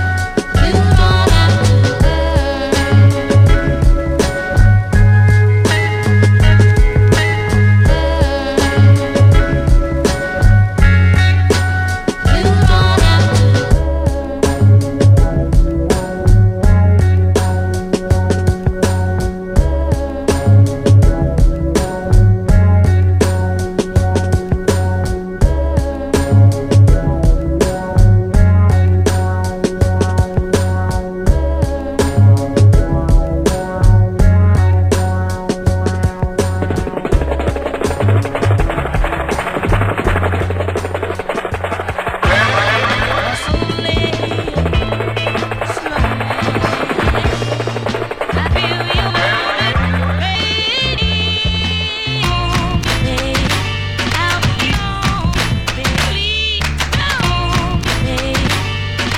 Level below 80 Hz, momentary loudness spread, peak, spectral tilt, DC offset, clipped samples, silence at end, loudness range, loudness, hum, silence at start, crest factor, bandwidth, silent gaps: -18 dBFS; 7 LU; 0 dBFS; -6 dB/octave; under 0.1%; under 0.1%; 0 s; 5 LU; -14 LUFS; none; 0 s; 12 dB; 14 kHz; none